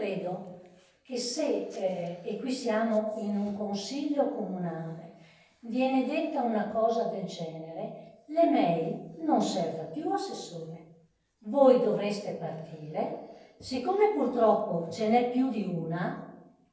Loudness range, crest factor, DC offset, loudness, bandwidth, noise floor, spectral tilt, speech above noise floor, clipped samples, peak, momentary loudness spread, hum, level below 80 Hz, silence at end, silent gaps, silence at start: 3 LU; 20 dB; under 0.1%; -30 LUFS; 8 kHz; -64 dBFS; -6 dB/octave; 34 dB; under 0.1%; -10 dBFS; 16 LU; none; -74 dBFS; 0.3 s; none; 0 s